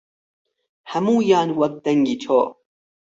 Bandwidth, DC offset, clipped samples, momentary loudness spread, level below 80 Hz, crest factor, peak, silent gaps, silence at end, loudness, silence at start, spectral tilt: 7.8 kHz; under 0.1%; under 0.1%; 8 LU; -66 dBFS; 16 dB; -4 dBFS; none; 0.55 s; -20 LUFS; 0.85 s; -6.5 dB/octave